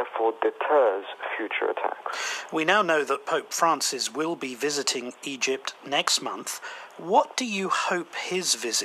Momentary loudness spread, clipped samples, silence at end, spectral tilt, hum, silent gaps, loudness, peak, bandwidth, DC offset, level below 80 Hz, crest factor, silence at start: 10 LU; under 0.1%; 0 s; -1.5 dB/octave; none; none; -26 LUFS; -6 dBFS; 15.5 kHz; under 0.1%; under -90 dBFS; 22 dB; 0 s